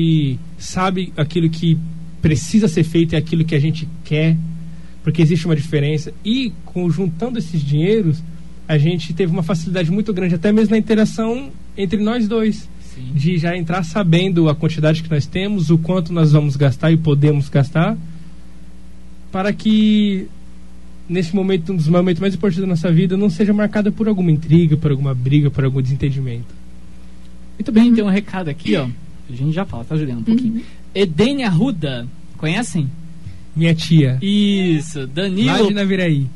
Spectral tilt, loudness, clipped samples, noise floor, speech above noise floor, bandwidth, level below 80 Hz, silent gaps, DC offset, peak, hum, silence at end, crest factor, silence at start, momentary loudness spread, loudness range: -7 dB/octave; -17 LUFS; under 0.1%; -40 dBFS; 24 dB; 11.5 kHz; -42 dBFS; none; 3%; -2 dBFS; none; 0 s; 16 dB; 0 s; 11 LU; 3 LU